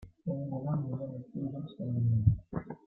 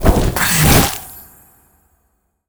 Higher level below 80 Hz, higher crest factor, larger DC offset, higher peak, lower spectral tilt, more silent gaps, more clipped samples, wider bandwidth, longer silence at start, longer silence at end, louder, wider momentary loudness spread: second, -52 dBFS vs -24 dBFS; about the same, 20 dB vs 16 dB; neither; second, -12 dBFS vs 0 dBFS; first, -12 dB/octave vs -4 dB/octave; neither; neither; second, 4 kHz vs over 20 kHz; about the same, 0 s vs 0 s; second, 0.1 s vs 1.25 s; second, -34 LUFS vs -12 LUFS; second, 12 LU vs 17 LU